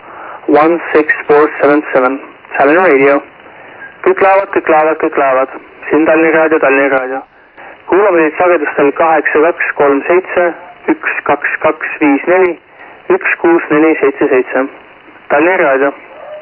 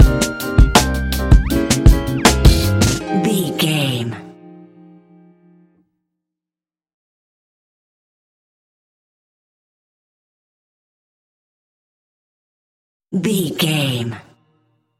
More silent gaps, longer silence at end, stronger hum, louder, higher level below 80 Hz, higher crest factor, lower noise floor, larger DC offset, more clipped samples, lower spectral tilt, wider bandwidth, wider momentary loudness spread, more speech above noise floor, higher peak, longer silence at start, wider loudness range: second, none vs 6.94-13.00 s; second, 0 s vs 0.8 s; neither; first, -10 LUFS vs -16 LUFS; second, -54 dBFS vs -22 dBFS; second, 10 dB vs 18 dB; second, -35 dBFS vs under -90 dBFS; neither; neither; first, -9.5 dB/octave vs -5 dB/octave; second, 4.9 kHz vs 16.5 kHz; about the same, 9 LU vs 11 LU; second, 25 dB vs over 71 dB; about the same, 0 dBFS vs 0 dBFS; about the same, 0.05 s vs 0 s; second, 2 LU vs 13 LU